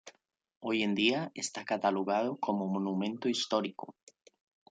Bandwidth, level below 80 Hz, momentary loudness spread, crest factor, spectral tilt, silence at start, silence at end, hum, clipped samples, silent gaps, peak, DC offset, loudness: 9.6 kHz; -80 dBFS; 10 LU; 20 dB; -4.5 dB/octave; 0.05 s; 0.8 s; none; under 0.1%; 0.57-0.61 s; -14 dBFS; under 0.1%; -32 LUFS